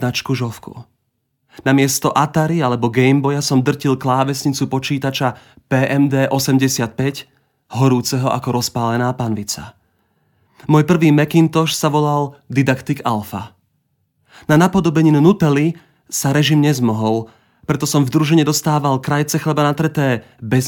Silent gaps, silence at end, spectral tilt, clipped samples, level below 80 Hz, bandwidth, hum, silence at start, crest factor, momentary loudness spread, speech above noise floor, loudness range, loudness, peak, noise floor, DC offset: none; 0 s; -5.5 dB/octave; under 0.1%; -52 dBFS; 19 kHz; none; 0 s; 16 dB; 10 LU; 54 dB; 3 LU; -16 LUFS; 0 dBFS; -69 dBFS; under 0.1%